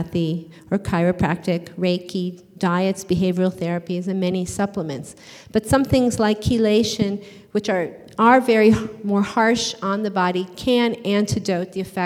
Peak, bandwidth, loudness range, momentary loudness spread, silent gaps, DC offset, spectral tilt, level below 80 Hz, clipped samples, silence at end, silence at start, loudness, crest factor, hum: -2 dBFS; 15.5 kHz; 4 LU; 10 LU; none; under 0.1%; -5.5 dB/octave; -46 dBFS; under 0.1%; 0 s; 0 s; -21 LUFS; 18 dB; none